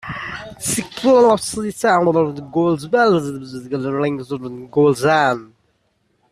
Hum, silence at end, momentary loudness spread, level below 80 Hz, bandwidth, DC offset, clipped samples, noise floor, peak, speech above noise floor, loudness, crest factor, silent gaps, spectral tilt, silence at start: none; 0.85 s; 14 LU; -54 dBFS; 14 kHz; under 0.1%; under 0.1%; -65 dBFS; -2 dBFS; 48 dB; -18 LUFS; 16 dB; none; -5 dB/octave; 0.05 s